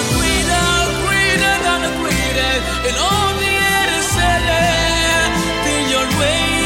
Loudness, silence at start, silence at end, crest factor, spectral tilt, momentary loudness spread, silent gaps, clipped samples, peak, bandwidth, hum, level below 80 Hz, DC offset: -15 LUFS; 0 s; 0 s; 14 dB; -3 dB/octave; 3 LU; none; under 0.1%; -2 dBFS; 16.5 kHz; none; -28 dBFS; under 0.1%